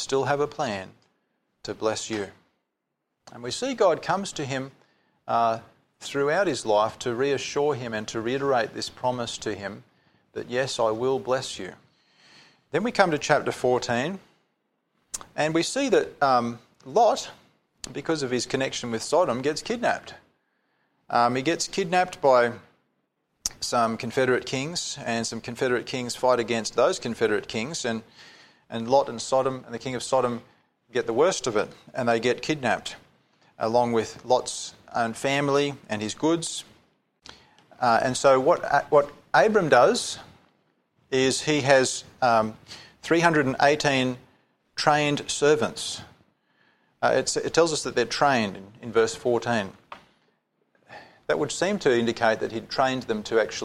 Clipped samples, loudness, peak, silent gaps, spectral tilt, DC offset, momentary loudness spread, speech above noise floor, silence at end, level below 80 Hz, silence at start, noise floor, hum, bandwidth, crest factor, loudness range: under 0.1%; -25 LUFS; -2 dBFS; none; -4 dB/octave; under 0.1%; 13 LU; 56 dB; 0 s; -62 dBFS; 0 s; -80 dBFS; none; 14.5 kHz; 24 dB; 6 LU